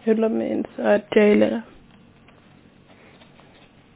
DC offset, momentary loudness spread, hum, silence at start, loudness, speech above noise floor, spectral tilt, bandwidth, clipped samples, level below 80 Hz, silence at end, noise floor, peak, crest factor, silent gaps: under 0.1%; 9 LU; none; 0.05 s; -20 LUFS; 32 dB; -10.5 dB/octave; 4 kHz; under 0.1%; -60 dBFS; 2.35 s; -52 dBFS; -4 dBFS; 20 dB; none